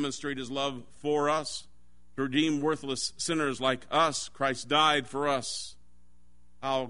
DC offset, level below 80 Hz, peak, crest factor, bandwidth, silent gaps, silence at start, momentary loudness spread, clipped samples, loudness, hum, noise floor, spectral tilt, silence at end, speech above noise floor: 0.4%; -64 dBFS; -10 dBFS; 20 dB; 11 kHz; none; 0 s; 12 LU; under 0.1%; -29 LUFS; none; -64 dBFS; -3.5 dB/octave; 0 s; 35 dB